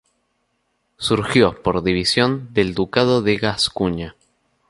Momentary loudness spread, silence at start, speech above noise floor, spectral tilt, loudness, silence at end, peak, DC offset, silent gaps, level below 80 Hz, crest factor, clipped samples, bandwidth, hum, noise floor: 7 LU; 1 s; 51 dB; -5 dB/octave; -19 LUFS; 0.6 s; -2 dBFS; under 0.1%; none; -44 dBFS; 18 dB; under 0.1%; 11.5 kHz; none; -69 dBFS